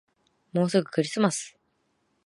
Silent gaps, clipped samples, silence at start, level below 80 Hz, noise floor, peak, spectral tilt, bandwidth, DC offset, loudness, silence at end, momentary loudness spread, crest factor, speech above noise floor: none; under 0.1%; 0.55 s; -76 dBFS; -72 dBFS; -8 dBFS; -5 dB/octave; 11.5 kHz; under 0.1%; -26 LUFS; 0.75 s; 9 LU; 20 dB; 47 dB